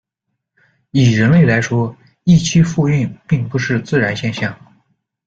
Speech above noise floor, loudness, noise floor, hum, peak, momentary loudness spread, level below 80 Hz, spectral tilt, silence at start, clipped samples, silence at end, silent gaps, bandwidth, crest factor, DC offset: 62 dB; -15 LUFS; -76 dBFS; none; -2 dBFS; 10 LU; -44 dBFS; -6.5 dB/octave; 0.95 s; under 0.1%; 0.7 s; none; 7.8 kHz; 14 dB; under 0.1%